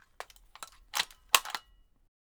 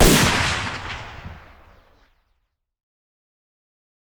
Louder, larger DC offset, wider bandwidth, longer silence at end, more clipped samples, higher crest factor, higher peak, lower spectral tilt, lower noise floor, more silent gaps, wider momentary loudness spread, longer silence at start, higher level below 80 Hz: second, -30 LUFS vs -20 LUFS; neither; about the same, over 20 kHz vs over 20 kHz; second, 0.7 s vs 2.75 s; neither; first, 34 dB vs 22 dB; about the same, -2 dBFS vs -2 dBFS; second, 2 dB/octave vs -3.5 dB/octave; second, -62 dBFS vs -71 dBFS; neither; about the same, 22 LU vs 24 LU; first, 0.2 s vs 0 s; second, -64 dBFS vs -32 dBFS